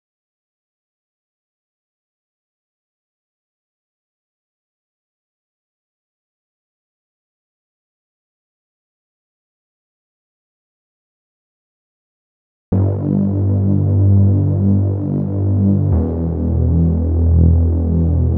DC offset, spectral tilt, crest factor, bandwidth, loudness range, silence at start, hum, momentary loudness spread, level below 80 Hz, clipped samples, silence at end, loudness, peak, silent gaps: under 0.1%; -15 dB/octave; 16 dB; 1.6 kHz; 8 LU; 12.7 s; none; 6 LU; -28 dBFS; under 0.1%; 0 s; -16 LUFS; -2 dBFS; none